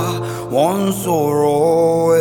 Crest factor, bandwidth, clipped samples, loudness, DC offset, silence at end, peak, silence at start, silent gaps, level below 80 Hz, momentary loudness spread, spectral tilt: 12 dB; 19 kHz; under 0.1%; -16 LUFS; under 0.1%; 0 s; -2 dBFS; 0 s; none; -50 dBFS; 7 LU; -6 dB/octave